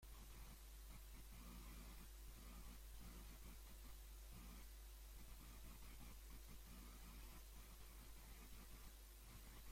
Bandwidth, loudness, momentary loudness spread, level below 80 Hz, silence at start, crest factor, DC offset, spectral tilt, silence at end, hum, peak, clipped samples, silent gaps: 16.5 kHz; -61 LUFS; 2 LU; -60 dBFS; 0 s; 12 dB; under 0.1%; -3.5 dB/octave; 0 s; none; -46 dBFS; under 0.1%; none